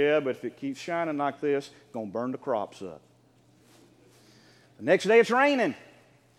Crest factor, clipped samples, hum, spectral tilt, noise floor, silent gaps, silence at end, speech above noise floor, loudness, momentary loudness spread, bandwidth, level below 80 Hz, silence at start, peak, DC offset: 20 dB; under 0.1%; none; -5 dB/octave; -61 dBFS; none; 0.6 s; 35 dB; -27 LUFS; 18 LU; 12.5 kHz; -80 dBFS; 0 s; -8 dBFS; under 0.1%